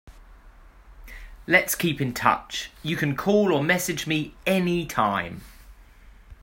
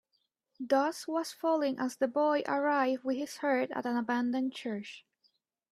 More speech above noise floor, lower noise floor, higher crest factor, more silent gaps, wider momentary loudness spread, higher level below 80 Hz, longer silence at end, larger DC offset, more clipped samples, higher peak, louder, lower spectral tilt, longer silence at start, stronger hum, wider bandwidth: second, 25 dB vs 48 dB; second, -49 dBFS vs -79 dBFS; first, 24 dB vs 16 dB; neither; first, 14 LU vs 10 LU; first, -48 dBFS vs -82 dBFS; second, 0.1 s vs 0.75 s; neither; neither; first, -2 dBFS vs -16 dBFS; first, -24 LUFS vs -32 LUFS; about the same, -4.5 dB/octave vs -4 dB/octave; second, 0.05 s vs 0.6 s; neither; first, 16.5 kHz vs 14 kHz